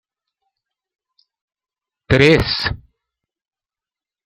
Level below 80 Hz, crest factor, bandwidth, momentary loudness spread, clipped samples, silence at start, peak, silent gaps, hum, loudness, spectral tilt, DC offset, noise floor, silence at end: -40 dBFS; 20 dB; 15 kHz; 13 LU; under 0.1%; 2.1 s; -2 dBFS; none; none; -15 LUFS; -6 dB/octave; under 0.1%; under -90 dBFS; 1.5 s